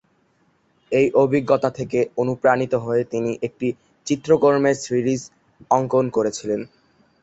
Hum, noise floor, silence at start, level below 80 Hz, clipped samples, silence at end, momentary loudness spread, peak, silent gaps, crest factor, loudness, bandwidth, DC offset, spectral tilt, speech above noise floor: none; -63 dBFS; 0.9 s; -58 dBFS; under 0.1%; 0.55 s; 10 LU; -2 dBFS; none; 18 dB; -21 LUFS; 8.2 kHz; under 0.1%; -6 dB/octave; 43 dB